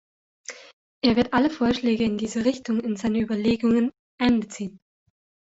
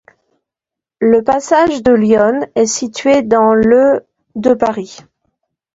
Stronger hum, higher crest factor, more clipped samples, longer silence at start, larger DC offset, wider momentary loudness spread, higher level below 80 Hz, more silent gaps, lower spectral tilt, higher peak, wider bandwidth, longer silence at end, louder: neither; about the same, 18 dB vs 14 dB; neither; second, 0.5 s vs 1 s; neither; first, 15 LU vs 8 LU; about the same, -52 dBFS vs -48 dBFS; first, 0.73-1.01 s, 3.99-4.18 s vs none; about the same, -5.5 dB/octave vs -4.5 dB/octave; second, -6 dBFS vs 0 dBFS; about the same, 8 kHz vs 8 kHz; about the same, 0.8 s vs 0.8 s; second, -23 LUFS vs -12 LUFS